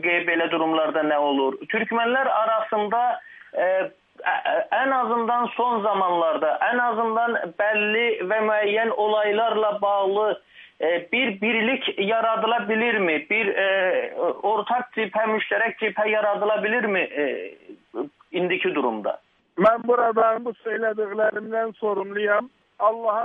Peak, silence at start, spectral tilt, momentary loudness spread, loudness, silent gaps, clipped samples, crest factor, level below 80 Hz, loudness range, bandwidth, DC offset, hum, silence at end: -6 dBFS; 0 s; -7.5 dB/octave; 6 LU; -22 LUFS; none; under 0.1%; 16 dB; -74 dBFS; 2 LU; 3.9 kHz; under 0.1%; none; 0 s